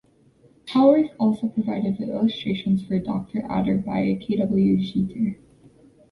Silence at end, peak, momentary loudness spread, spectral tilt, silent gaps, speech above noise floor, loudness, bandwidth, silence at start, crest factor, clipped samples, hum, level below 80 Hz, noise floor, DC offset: 0.8 s; -4 dBFS; 10 LU; -9 dB/octave; none; 35 dB; -23 LUFS; 10.5 kHz; 0.65 s; 18 dB; under 0.1%; none; -54 dBFS; -57 dBFS; under 0.1%